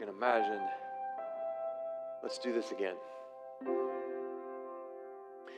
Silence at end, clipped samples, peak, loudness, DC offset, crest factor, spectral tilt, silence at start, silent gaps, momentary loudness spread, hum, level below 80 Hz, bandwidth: 0 s; under 0.1%; -16 dBFS; -38 LUFS; under 0.1%; 22 dB; -4 dB/octave; 0 s; none; 16 LU; none; under -90 dBFS; 10 kHz